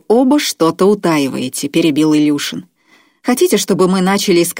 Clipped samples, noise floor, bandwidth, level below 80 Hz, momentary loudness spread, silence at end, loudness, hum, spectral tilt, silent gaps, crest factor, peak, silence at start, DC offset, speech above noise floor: under 0.1%; -52 dBFS; 16.5 kHz; -60 dBFS; 7 LU; 0 s; -13 LUFS; none; -4.5 dB/octave; none; 12 dB; 0 dBFS; 0.1 s; under 0.1%; 39 dB